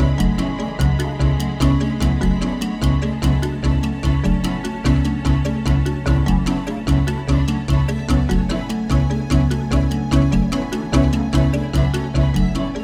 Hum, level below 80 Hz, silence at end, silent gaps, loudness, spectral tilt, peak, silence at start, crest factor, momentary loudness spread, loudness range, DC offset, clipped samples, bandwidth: none; -22 dBFS; 0 s; none; -19 LUFS; -7 dB/octave; -2 dBFS; 0 s; 14 dB; 3 LU; 1 LU; under 0.1%; under 0.1%; 14 kHz